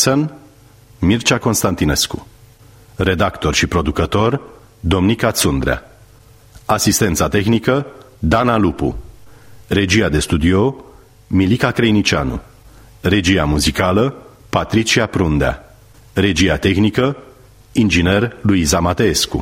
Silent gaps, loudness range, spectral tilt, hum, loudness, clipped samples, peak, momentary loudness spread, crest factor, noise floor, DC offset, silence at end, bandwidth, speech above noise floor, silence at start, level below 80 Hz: none; 2 LU; -4.5 dB/octave; none; -16 LUFS; under 0.1%; 0 dBFS; 9 LU; 16 dB; -45 dBFS; under 0.1%; 0 s; 16 kHz; 30 dB; 0 s; -32 dBFS